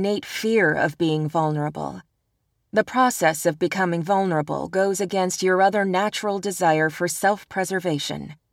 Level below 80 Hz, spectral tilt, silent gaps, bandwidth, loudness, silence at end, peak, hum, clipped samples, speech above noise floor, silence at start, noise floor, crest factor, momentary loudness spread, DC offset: -62 dBFS; -4.5 dB/octave; none; 17.5 kHz; -22 LUFS; 0.2 s; -6 dBFS; none; under 0.1%; 50 dB; 0 s; -72 dBFS; 16 dB; 7 LU; under 0.1%